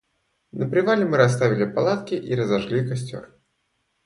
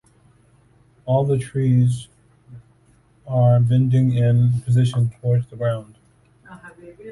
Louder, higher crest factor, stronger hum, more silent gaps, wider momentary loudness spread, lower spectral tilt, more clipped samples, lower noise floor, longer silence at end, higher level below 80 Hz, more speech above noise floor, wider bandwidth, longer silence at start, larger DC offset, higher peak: second, -22 LUFS vs -19 LUFS; first, 20 dB vs 14 dB; neither; neither; about the same, 12 LU vs 12 LU; second, -6.5 dB/octave vs -8.5 dB/octave; neither; first, -72 dBFS vs -56 dBFS; first, 0.8 s vs 0 s; second, -60 dBFS vs -50 dBFS; first, 51 dB vs 38 dB; about the same, 11.5 kHz vs 11.5 kHz; second, 0.55 s vs 1.05 s; neither; about the same, -4 dBFS vs -6 dBFS